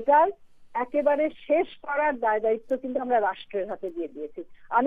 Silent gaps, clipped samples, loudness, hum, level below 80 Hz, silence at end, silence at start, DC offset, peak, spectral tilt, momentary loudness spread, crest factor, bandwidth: none; under 0.1%; -26 LUFS; none; -62 dBFS; 0 s; 0 s; under 0.1%; -10 dBFS; -7 dB/octave; 11 LU; 16 dB; 4.6 kHz